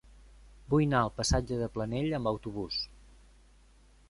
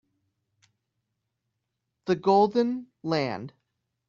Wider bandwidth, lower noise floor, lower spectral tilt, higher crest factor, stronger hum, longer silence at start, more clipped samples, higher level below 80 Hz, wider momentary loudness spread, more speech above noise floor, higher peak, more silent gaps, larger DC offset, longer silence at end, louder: first, 11.5 kHz vs 7.2 kHz; second, -60 dBFS vs -82 dBFS; about the same, -5.5 dB/octave vs -5 dB/octave; about the same, 20 dB vs 20 dB; neither; second, 0.45 s vs 2.05 s; neither; first, -46 dBFS vs -70 dBFS; second, 8 LU vs 17 LU; second, 30 dB vs 57 dB; second, -12 dBFS vs -8 dBFS; neither; neither; first, 1.25 s vs 0.6 s; second, -31 LUFS vs -25 LUFS